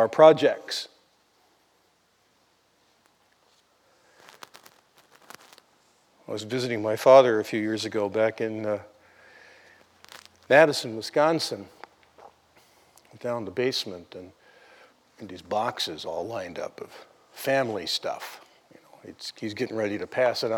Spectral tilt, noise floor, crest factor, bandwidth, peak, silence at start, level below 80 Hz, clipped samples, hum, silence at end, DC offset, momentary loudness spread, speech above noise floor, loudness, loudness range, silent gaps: -4.5 dB/octave; -66 dBFS; 24 dB; 17.5 kHz; -4 dBFS; 0 s; -76 dBFS; under 0.1%; none; 0 s; under 0.1%; 26 LU; 42 dB; -25 LUFS; 11 LU; none